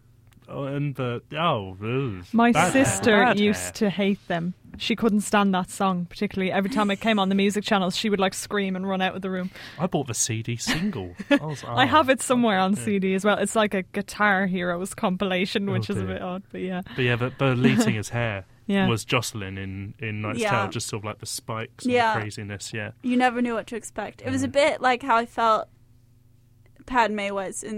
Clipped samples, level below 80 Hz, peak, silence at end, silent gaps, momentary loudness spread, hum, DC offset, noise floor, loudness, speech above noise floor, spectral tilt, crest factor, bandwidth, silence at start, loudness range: under 0.1%; -56 dBFS; -6 dBFS; 0 s; none; 12 LU; none; under 0.1%; -56 dBFS; -24 LUFS; 32 dB; -4.5 dB/octave; 18 dB; 16 kHz; 0.5 s; 5 LU